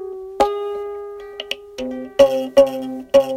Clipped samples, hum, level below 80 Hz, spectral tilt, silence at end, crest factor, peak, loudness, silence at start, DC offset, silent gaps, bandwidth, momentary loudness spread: under 0.1%; none; -50 dBFS; -4 dB/octave; 0 s; 18 dB; 0 dBFS; -19 LUFS; 0 s; under 0.1%; none; 15.5 kHz; 16 LU